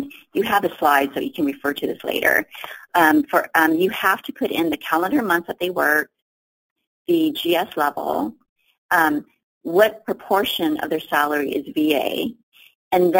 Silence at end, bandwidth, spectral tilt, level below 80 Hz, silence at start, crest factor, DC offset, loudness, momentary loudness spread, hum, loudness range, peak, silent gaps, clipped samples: 0 s; 17 kHz; -4 dB/octave; -60 dBFS; 0 s; 20 dB; under 0.1%; -20 LUFS; 8 LU; none; 3 LU; -2 dBFS; 6.22-6.76 s, 6.87-7.05 s, 8.49-8.56 s, 8.78-8.89 s, 9.43-9.61 s, 12.43-12.52 s, 12.75-12.91 s; under 0.1%